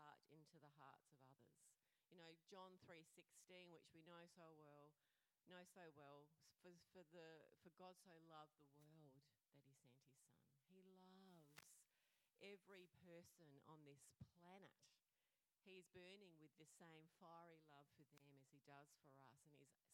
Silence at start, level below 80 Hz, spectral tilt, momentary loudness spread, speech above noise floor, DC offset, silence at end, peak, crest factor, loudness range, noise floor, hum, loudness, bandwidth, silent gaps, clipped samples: 0 s; under -90 dBFS; -4.5 dB/octave; 4 LU; over 21 dB; under 0.1%; 0 s; -44 dBFS; 26 dB; 2 LU; under -90 dBFS; none; -68 LUFS; 14.5 kHz; none; under 0.1%